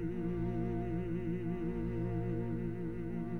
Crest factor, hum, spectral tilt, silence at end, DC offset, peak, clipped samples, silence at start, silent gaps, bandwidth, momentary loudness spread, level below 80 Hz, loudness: 10 dB; none; -10.5 dB/octave; 0 s; 0.5%; -26 dBFS; under 0.1%; 0 s; none; 4.2 kHz; 3 LU; -48 dBFS; -38 LUFS